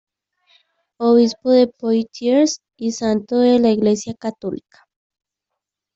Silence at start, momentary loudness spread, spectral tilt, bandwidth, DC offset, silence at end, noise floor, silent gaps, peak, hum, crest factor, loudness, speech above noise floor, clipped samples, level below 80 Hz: 1 s; 12 LU; -5 dB/octave; 8 kHz; under 0.1%; 1.4 s; -82 dBFS; none; -4 dBFS; none; 16 dB; -17 LUFS; 65 dB; under 0.1%; -62 dBFS